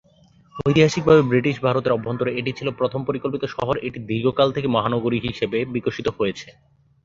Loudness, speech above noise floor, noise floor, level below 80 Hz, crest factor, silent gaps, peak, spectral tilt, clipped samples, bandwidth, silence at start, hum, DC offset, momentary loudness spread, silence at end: -21 LUFS; 34 dB; -54 dBFS; -50 dBFS; 20 dB; none; -2 dBFS; -6.5 dB/octave; under 0.1%; 7.6 kHz; 0.55 s; none; under 0.1%; 10 LU; 0.55 s